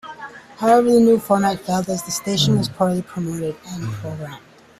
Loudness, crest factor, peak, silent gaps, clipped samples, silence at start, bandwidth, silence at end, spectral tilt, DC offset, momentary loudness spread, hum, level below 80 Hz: -19 LUFS; 16 dB; -2 dBFS; none; under 0.1%; 0.05 s; 15.5 kHz; 0.4 s; -5.5 dB/octave; under 0.1%; 18 LU; none; -54 dBFS